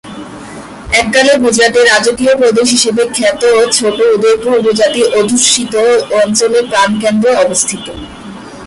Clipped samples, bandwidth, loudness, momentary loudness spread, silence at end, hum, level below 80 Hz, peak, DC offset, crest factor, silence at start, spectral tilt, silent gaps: under 0.1%; 11.5 kHz; -9 LUFS; 19 LU; 0 s; none; -42 dBFS; 0 dBFS; under 0.1%; 10 dB; 0.05 s; -2.5 dB/octave; none